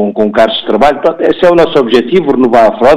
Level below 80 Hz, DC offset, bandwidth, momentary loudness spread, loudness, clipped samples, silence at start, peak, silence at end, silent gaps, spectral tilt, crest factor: -36 dBFS; under 0.1%; 12 kHz; 4 LU; -8 LUFS; 0.3%; 0 s; 0 dBFS; 0 s; none; -6 dB/octave; 8 dB